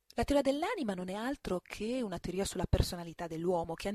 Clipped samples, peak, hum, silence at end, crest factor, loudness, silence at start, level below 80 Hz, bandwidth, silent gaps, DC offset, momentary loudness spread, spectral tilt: under 0.1%; -14 dBFS; none; 0 s; 20 dB; -35 LUFS; 0.15 s; -44 dBFS; 15 kHz; none; under 0.1%; 8 LU; -5.5 dB/octave